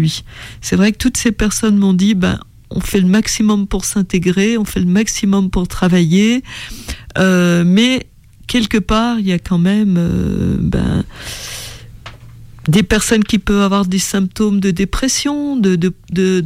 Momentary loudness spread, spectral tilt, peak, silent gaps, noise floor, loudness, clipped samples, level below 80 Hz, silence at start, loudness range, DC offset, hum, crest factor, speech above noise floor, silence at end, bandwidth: 13 LU; -5 dB/octave; -2 dBFS; none; -36 dBFS; -14 LUFS; under 0.1%; -30 dBFS; 0 s; 3 LU; under 0.1%; none; 12 dB; 22 dB; 0 s; 16 kHz